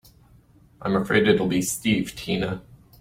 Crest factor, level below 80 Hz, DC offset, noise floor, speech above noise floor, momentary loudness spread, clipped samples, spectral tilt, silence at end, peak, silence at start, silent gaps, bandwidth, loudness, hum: 20 dB; -52 dBFS; under 0.1%; -54 dBFS; 32 dB; 11 LU; under 0.1%; -4.5 dB/octave; 0.25 s; -4 dBFS; 0.8 s; none; 16.5 kHz; -23 LUFS; none